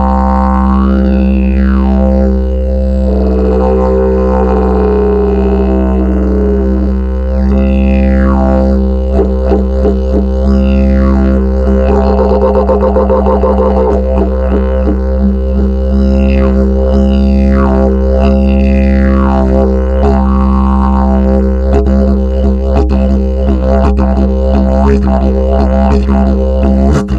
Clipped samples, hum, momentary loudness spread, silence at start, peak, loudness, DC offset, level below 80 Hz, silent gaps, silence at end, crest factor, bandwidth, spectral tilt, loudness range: 0.2%; none; 3 LU; 0 s; 0 dBFS; -10 LUFS; under 0.1%; -12 dBFS; none; 0 s; 8 dB; 5.2 kHz; -10 dB/octave; 1 LU